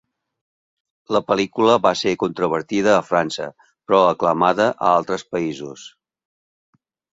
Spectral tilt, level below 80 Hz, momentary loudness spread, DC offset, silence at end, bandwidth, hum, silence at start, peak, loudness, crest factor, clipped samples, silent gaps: -5 dB/octave; -60 dBFS; 12 LU; under 0.1%; 1.3 s; 7.8 kHz; none; 1.1 s; -2 dBFS; -19 LUFS; 20 dB; under 0.1%; none